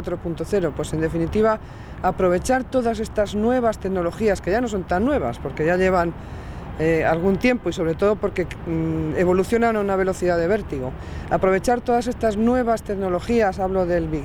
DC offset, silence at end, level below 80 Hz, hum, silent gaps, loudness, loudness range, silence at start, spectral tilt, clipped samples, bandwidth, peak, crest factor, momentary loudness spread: under 0.1%; 0 s; -38 dBFS; none; none; -21 LUFS; 1 LU; 0 s; -6.5 dB/octave; under 0.1%; over 20 kHz; -6 dBFS; 16 dB; 8 LU